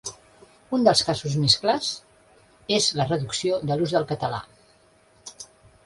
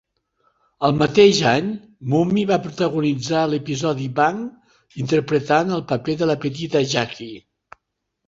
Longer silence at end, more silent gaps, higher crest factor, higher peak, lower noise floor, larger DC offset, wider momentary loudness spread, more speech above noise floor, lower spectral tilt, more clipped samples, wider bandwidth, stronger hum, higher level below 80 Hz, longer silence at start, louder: second, 0.4 s vs 0.9 s; neither; about the same, 22 dB vs 20 dB; about the same, -4 dBFS vs -2 dBFS; second, -58 dBFS vs -77 dBFS; neither; first, 22 LU vs 14 LU; second, 35 dB vs 58 dB; second, -4 dB/octave vs -5.5 dB/octave; neither; first, 11.5 kHz vs 7.8 kHz; neither; about the same, -58 dBFS vs -56 dBFS; second, 0.05 s vs 0.8 s; second, -23 LUFS vs -20 LUFS